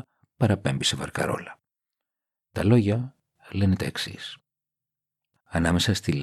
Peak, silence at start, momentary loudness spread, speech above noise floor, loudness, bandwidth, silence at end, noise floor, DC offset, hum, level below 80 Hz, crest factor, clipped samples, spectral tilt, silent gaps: -8 dBFS; 0.4 s; 16 LU; 64 dB; -25 LUFS; 13 kHz; 0 s; -88 dBFS; under 0.1%; none; -50 dBFS; 20 dB; under 0.1%; -5.5 dB/octave; none